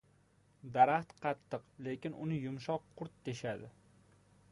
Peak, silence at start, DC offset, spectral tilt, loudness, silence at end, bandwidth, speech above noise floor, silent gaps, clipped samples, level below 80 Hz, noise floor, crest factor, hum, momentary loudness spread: -14 dBFS; 0.65 s; under 0.1%; -6.5 dB/octave; -37 LUFS; 0.8 s; 11.5 kHz; 33 dB; none; under 0.1%; -72 dBFS; -69 dBFS; 24 dB; none; 17 LU